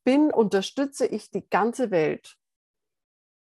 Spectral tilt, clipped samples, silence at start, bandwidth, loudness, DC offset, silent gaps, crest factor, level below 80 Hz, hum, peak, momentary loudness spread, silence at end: -5.5 dB/octave; under 0.1%; 0.05 s; 12.5 kHz; -25 LUFS; under 0.1%; none; 18 dB; -76 dBFS; none; -8 dBFS; 8 LU; 1.15 s